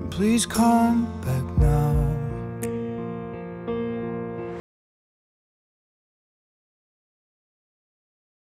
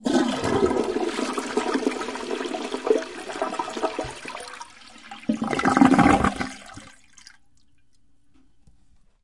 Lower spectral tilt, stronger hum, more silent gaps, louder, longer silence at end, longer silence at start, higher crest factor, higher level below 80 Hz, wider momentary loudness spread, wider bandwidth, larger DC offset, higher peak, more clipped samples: about the same, -6 dB/octave vs -5 dB/octave; neither; neither; about the same, -24 LUFS vs -24 LUFS; first, 3.9 s vs 2.35 s; about the same, 0 s vs 0 s; second, 18 dB vs 24 dB; first, -36 dBFS vs -48 dBFS; second, 14 LU vs 21 LU; first, 16 kHz vs 11.5 kHz; second, under 0.1% vs 0.2%; second, -8 dBFS vs -2 dBFS; neither